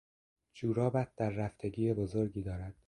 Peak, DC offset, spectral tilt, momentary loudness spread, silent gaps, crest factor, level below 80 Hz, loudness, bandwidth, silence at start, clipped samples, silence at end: -18 dBFS; under 0.1%; -9 dB/octave; 7 LU; none; 18 dB; -54 dBFS; -35 LUFS; 11 kHz; 0.55 s; under 0.1%; 0.15 s